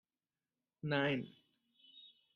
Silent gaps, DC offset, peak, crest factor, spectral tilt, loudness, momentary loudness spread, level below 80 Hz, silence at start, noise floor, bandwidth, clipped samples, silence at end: none; under 0.1%; -20 dBFS; 24 dB; -7.5 dB/octave; -38 LUFS; 23 LU; -80 dBFS; 0.85 s; under -90 dBFS; 6.8 kHz; under 0.1%; 0.3 s